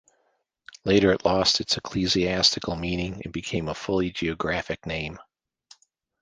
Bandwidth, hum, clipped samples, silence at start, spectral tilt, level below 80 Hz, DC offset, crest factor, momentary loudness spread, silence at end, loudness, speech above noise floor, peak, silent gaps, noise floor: 10 kHz; none; under 0.1%; 0.85 s; -4 dB/octave; -46 dBFS; under 0.1%; 20 dB; 11 LU; 1 s; -24 LUFS; 47 dB; -6 dBFS; none; -72 dBFS